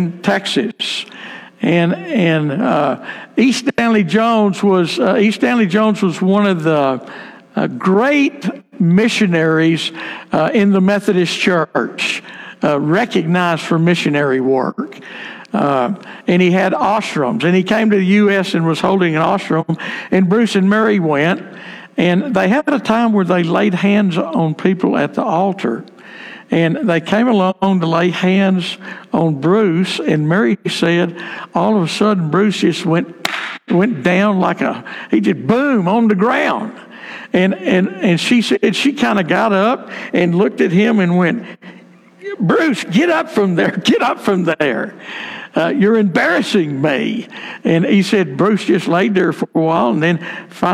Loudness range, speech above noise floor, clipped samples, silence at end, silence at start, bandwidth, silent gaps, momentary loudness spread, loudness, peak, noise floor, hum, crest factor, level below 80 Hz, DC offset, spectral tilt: 2 LU; 25 dB; under 0.1%; 0 s; 0 s; 12.5 kHz; none; 10 LU; -15 LUFS; -2 dBFS; -39 dBFS; none; 14 dB; -58 dBFS; under 0.1%; -6 dB/octave